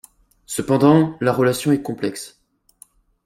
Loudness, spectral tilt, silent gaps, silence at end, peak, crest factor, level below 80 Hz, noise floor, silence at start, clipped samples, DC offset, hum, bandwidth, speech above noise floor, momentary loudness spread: -18 LUFS; -6 dB/octave; none; 1 s; -2 dBFS; 18 dB; -56 dBFS; -52 dBFS; 0.5 s; under 0.1%; under 0.1%; none; 16 kHz; 34 dB; 14 LU